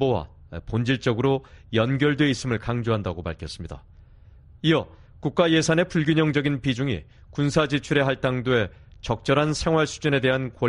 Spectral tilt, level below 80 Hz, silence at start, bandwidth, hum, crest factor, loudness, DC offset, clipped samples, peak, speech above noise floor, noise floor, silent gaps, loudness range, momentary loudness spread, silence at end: -6 dB/octave; -46 dBFS; 0 s; 11 kHz; none; 18 dB; -23 LUFS; under 0.1%; under 0.1%; -6 dBFS; 26 dB; -49 dBFS; none; 3 LU; 13 LU; 0 s